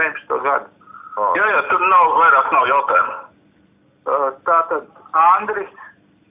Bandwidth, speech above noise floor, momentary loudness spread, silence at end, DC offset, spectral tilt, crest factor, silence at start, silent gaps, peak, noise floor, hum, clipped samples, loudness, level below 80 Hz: 3.8 kHz; 40 dB; 14 LU; 0.45 s; under 0.1%; -6.5 dB/octave; 16 dB; 0 s; none; -2 dBFS; -55 dBFS; none; under 0.1%; -16 LUFS; -64 dBFS